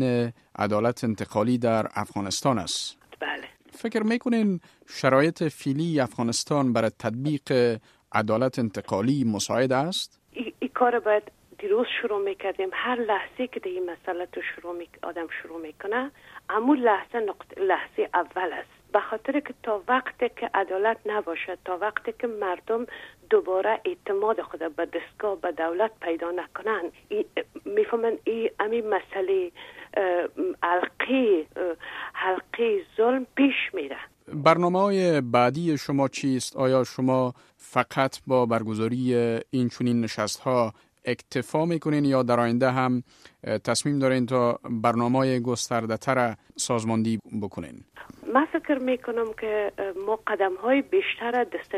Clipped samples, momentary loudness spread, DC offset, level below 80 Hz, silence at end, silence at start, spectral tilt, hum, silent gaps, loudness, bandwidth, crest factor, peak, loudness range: under 0.1%; 10 LU; under 0.1%; -66 dBFS; 0 s; 0 s; -5.5 dB/octave; none; none; -26 LUFS; 14 kHz; 22 dB; -4 dBFS; 4 LU